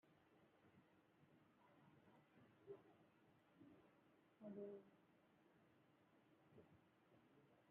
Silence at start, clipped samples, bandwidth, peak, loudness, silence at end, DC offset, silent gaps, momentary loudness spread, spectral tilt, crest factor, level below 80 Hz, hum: 0.05 s; under 0.1%; 3.9 kHz; -46 dBFS; -61 LUFS; 0 s; under 0.1%; none; 7 LU; -5.5 dB/octave; 22 dB; under -90 dBFS; none